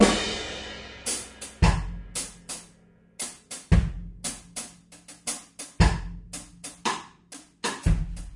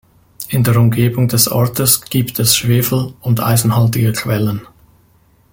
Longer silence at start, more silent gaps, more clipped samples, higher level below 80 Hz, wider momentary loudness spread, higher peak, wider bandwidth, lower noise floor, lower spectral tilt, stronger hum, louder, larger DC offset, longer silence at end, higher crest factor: second, 0 s vs 0.4 s; neither; neither; first, -34 dBFS vs -44 dBFS; first, 17 LU vs 6 LU; second, -4 dBFS vs 0 dBFS; second, 11.5 kHz vs 17 kHz; first, -57 dBFS vs -52 dBFS; about the same, -4.5 dB/octave vs -4.5 dB/octave; neither; second, -29 LUFS vs -14 LUFS; neither; second, 0 s vs 0.9 s; first, 24 dB vs 14 dB